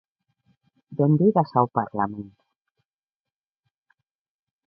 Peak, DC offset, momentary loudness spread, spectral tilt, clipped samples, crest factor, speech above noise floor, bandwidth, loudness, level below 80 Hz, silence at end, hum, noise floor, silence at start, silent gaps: -4 dBFS; under 0.1%; 19 LU; -12.5 dB/octave; under 0.1%; 22 dB; over 69 dB; 5.4 kHz; -22 LUFS; -66 dBFS; 2.4 s; none; under -90 dBFS; 0.9 s; none